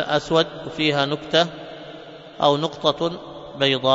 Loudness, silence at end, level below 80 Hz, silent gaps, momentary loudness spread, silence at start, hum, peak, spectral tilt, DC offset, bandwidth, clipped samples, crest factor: -21 LUFS; 0 s; -56 dBFS; none; 18 LU; 0 s; none; -2 dBFS; -5 dB/octave; under 0.1%; 7.8 kHz; under 0.1%; 20 dB